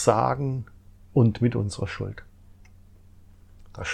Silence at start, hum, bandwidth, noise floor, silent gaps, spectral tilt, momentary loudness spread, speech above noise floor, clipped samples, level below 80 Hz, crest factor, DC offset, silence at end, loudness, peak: 0 s; none; 11 kHz; -51 dBFS; none; -6.5 dB/octave; 21 LU; 27 dB; under 0.1%; -50 dBFS; 22 dB; under 0.1%; 0 s; -26 LUFS; -4 dBFS